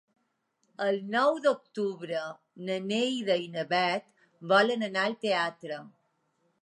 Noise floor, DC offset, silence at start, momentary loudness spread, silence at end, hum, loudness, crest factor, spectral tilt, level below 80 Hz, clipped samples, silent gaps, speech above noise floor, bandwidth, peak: -76 dBFS; under 0.1%; 0.8 s; 15 LU; 0.75 s; none; -29 LUFS; 20 dB; -4.5 dB/octave; -86 dBFS; under 0.1%; none; 47 dB; 10.5 kHz; -10 dBFS